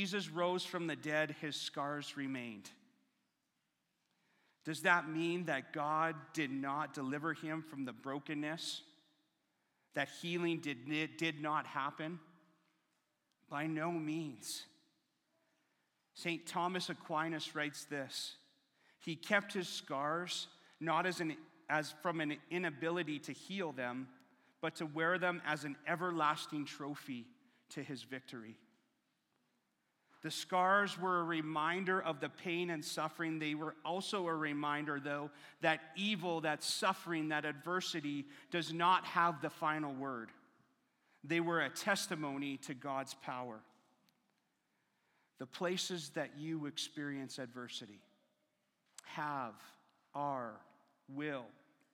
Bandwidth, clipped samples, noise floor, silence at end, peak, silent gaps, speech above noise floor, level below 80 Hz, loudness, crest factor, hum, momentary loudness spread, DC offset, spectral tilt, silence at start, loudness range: 17 kHz; under 0.1%; -85 dBFS; 0.4 s; -16 dBFS; none; 45 dB; under -90 dBFS; -39 LUFS; 26 dB; none; 13 LU; under 0.1%; -4 dB/octave; 0 s; 8 LU